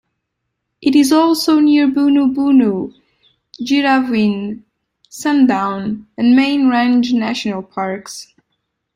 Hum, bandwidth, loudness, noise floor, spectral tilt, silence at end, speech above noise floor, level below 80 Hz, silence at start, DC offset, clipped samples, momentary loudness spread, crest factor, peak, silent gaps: none; 15.5 kHz; -14 LUFS; -74 dBFS; -5 dB/octave; 0.75 s; 61 dB; -58 dBFS; 0.8 s; under 0.1%; under 0.1%; 13 LU; 14 dB; -2 dBFS; none